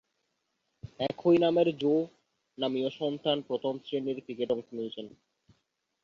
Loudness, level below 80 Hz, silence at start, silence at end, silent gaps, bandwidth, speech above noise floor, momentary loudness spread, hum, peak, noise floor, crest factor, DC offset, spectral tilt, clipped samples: -30 LUFS; -70 dBFS; 0.85 s; 0.95 s; none; 7 kHz; 50 dB; 16 LU; none; -12 dBFS; -79 dBFS; 18 dB; under 0.1%; -7.5 dB/octave; under 0.1%